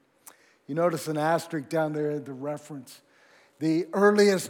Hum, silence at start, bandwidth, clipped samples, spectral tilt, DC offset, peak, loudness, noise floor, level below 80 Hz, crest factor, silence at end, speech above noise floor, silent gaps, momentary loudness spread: none; 0.7 s; 17.5 kHz; under 0.1%; -5.5 dB/octave; under 0.1%; -8 dBFS; -26 LUFS; -59 dBFS; -88 dBFS; 20 dB; 0 s; 33 dB; none; 14 LU